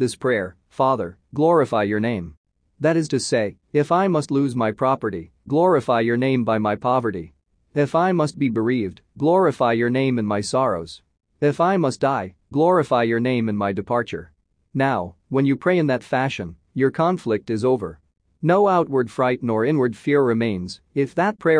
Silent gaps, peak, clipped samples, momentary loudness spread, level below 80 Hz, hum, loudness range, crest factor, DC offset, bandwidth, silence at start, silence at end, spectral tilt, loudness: 2.37-2.44 s; -6 dBFS; under 0.1%; 9 LU; -58 dBFS; none; 2 LU; 16 dB; under 0.1%; 10.5 kHz; 0 s; 0 s; -6.5 dB/octave; -21 LUFS